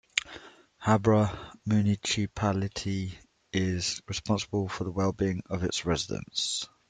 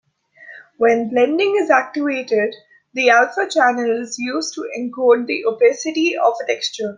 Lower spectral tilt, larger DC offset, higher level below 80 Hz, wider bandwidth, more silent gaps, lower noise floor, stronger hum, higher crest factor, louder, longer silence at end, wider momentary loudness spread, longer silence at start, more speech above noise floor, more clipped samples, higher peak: first, -5 dB/octave vs -3 dB/octave; neither; first, -54 dBFS vs -70 dBFS; about the same, 9.4 kHz vs 9.6 kHz; neither; first, -50 dBFS vs -44 dBFS; neither; first, 26 dB vs 16 dB; second, -29 LUFS vs -17 LUFS; first, 0.25 s vs 0 s; about the same, 9 LU vs 9 LU; second, 0.15 s vs 0.4 s; second, 22 dB vs 27 dB; neither; about the same, -2 dBFS vs -2 dBFS